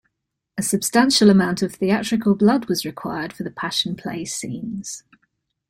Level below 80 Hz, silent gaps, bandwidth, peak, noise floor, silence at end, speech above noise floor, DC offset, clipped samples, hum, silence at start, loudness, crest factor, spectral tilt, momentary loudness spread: -58 dBFS; none; 16 kHz; -2 dBFS; -78 dBFS; 0.7 s; 58 dB; under 0.1%; under 0.1%; none; 0.55 s; -20 LUFS; 18 dB; -4.5 dB/octave; 15 LU